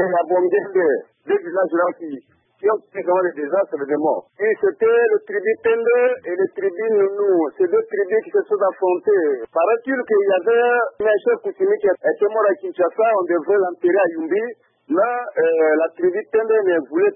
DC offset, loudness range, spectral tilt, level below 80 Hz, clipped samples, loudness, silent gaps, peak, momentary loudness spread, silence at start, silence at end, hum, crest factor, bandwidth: under 0.1%; 3 LU; -10.5 dB/octave; -70 dBFS; under 0.1%; -19 LUFS; none; -6 dBFS; 5 LU; 0 s; 0 s; none; 12 dB; 3.6 kHz